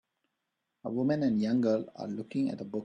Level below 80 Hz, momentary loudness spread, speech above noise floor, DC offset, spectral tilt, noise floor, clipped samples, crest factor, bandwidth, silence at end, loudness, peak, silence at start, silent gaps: -72 dBFS; 11 LU; 54 dB; under 0.1%; -8 dB/octave; -84 dBFS; under 0.1%; 16 dB; 8.8 kHz; 0 s; -31 LUFS; -16 dBFS; 0.85 s; none